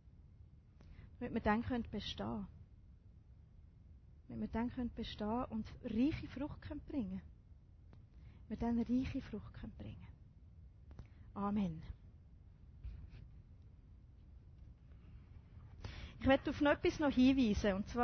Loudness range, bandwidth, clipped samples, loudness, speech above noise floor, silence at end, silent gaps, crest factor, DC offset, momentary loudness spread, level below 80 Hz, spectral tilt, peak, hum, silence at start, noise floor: 19 LU; 6.4 kHz; under 0.1%; -39 LUFS; 23 dB; 0 s; none; 22 dB; under 0.1%; 26 LU; -54 dBFS; -5 dB/octave; -20 dBFS; none; 0.05 s; -61 dBFS